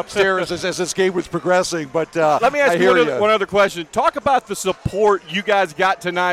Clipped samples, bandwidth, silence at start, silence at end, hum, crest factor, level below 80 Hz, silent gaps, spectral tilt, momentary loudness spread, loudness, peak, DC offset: under 0.1%; 15 kHz; 0 s; 0 s; none; 12 dB; -48 dBFS; none; -4 dB/octave; 7 LU; -18 LUFS; -6 dBFS; under 0.1%